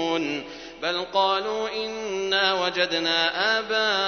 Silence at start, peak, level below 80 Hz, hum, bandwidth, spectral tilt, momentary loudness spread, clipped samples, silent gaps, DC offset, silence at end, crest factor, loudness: 0 s; -6 dBFS; -60 dBFS; none; 6.6 kHz; -2.5 dB/octave; 8 LU; under 0.1%; none; under 0.1%; 0 s; 18 dB; -24 LUFS